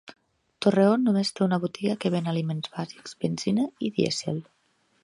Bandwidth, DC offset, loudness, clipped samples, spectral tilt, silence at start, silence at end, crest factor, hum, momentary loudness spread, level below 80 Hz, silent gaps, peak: 11.5 kHz; under 0.1%; -26 LUFS; under 0.1%; -6 dB/octave; 0.1 s; 0.6 s; 20 dB; none; 12 LU; -70 dBFS; none; -6 dBFS